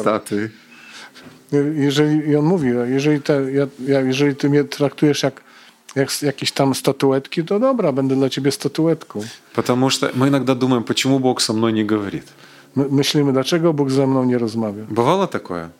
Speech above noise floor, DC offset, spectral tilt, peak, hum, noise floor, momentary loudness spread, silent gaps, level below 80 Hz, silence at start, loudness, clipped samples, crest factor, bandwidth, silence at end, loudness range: 26 dB; under 0.1%; -5.5 dB/octave; -2 dBFS; none; -44 dBFS; 8 LU; none; -62 dBFS; 0 s; -18 LUFS; under 0.1%; 16 dB; 16 kHz; 0.1 s; 2 LU